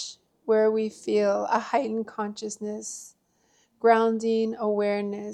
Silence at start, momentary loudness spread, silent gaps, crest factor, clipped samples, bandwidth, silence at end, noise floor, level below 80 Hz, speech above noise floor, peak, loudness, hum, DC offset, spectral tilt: 0 s; 13 LU; none; 20 dB; under 0.1%; 12 kHz; 0 s; -67 dBFS; -76 dBFS; 42 dB; -6 dBFS; -26 LUFS; none; under 0.1%; -4.5 dB/octave